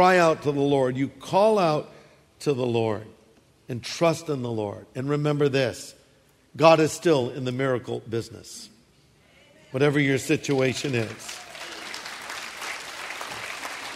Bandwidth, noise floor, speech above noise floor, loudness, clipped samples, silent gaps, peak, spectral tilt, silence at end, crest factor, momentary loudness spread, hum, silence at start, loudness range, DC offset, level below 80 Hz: 15.5 kHz; -59 dBFS; 36 dB; -25 LUFS; under 0.1%; none; -2 dBFS; -5.5 dB/octave; 0 s; 22 dB; 16 LU; none; 0 s; 5 LU; under 0.1%; -64 dBFS